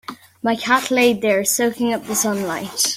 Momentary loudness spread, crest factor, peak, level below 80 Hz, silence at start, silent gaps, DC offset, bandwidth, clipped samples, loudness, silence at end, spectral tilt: 8 LU; 16 dB; -4 dBFS; -62 dBFS; 0.1 s; none; under 0.1%; 16.5 kHz; under 0.1%; -18 LUFS; 0 s; -2.5 dB/octave